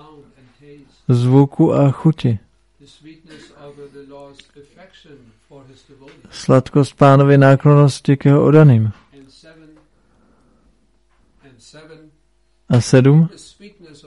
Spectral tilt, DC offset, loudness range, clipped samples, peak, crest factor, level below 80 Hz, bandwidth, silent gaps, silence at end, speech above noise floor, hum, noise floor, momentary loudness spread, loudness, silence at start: -8 dB/octave; under 0.1%; 13 LU; under 0.1%; 0 dBFS; 16 dB; -52 dBFS; 11.5 kHz; none; 0.8 s; 48 dB; none; -61 dBFS; 11 LU; -13 LUFS; 1.1 s